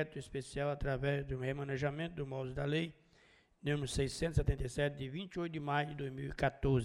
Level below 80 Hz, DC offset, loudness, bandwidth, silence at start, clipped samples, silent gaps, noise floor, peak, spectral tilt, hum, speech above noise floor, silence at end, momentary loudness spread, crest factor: -48 dBFS; under 0.1%; -38 LUFS; 12 kHz; 0 s; under 0.1%; none; -67 dBFS; -20 dBFS; -6 dB/octave; none; 30 dB; 0 s; 7 LU; 18 dB